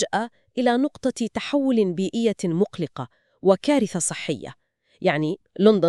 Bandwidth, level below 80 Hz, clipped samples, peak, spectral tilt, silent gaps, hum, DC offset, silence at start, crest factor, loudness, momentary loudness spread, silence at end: 12 kHz; -64 dBFS; under 0.1%; -4 dBFS; -5 dB/octave; none; none; under 0.1%; 0 s; 18 dB; -23 LUFS; 11 LU; 0 s